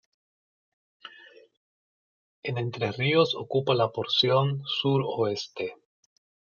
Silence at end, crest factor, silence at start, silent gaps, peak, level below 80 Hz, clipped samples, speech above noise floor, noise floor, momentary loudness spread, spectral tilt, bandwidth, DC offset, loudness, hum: 0.8 s; 20 dB; 1.05 s; 1.57-2.43 s; -10 dBFS; -72 dBFS; under 0.1%; 27 dB; -53 dBFS; 14 LU; -6 dB/octave; 7 kHz; under 0.1%; -26 LUFS; none